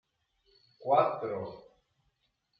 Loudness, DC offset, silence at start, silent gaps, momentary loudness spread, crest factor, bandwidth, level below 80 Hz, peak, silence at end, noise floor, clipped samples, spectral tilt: -30 LUFS; under 0.1%; 0.8 s; none; 16 LU; 22 dB; 5.4 kHz; -76 dBFS; -12 dBFS; 1 s; -78 dBFS; under 0.1%; -5 dB/octave